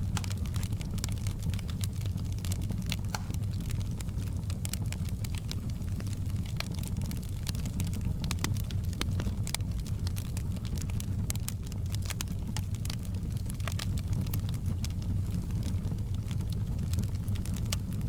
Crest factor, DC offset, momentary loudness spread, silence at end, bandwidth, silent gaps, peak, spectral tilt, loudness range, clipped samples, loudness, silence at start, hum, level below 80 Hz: 24 dB; under 0.1%; 3 LU; 0 s; 19.5 kHz; none; -8 dBFS; -5.5 dB/octave; 1 LU; under 0.1%; -34 LUFS; 0 s; none; -38 dBFS